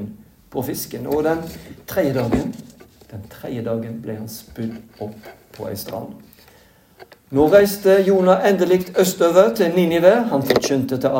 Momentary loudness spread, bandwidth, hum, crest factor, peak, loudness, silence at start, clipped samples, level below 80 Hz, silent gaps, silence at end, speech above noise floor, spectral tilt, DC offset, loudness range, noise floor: 19 LU; 17 kHz; none; 18 dB; 0 dBFS; -18 LUFS; 0 s; under 0.1%; -48 dBFS; none; 0 s; 33 dB; -5.5 dB/octave; under 0.1%; 15 LU; -51 dBFS